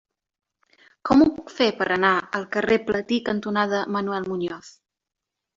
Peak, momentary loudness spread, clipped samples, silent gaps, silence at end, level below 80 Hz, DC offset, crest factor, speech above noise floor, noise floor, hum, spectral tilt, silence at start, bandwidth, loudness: -4 dBFS; 11 LU; under 0.1%; none; 0.85 s; -56 dBFS; under 0.1%; 20 dB; 36 dB; -59 dBFS; none; -5.5 dB/octave; 1.05 s; 7.6 kHz; -22 LUFS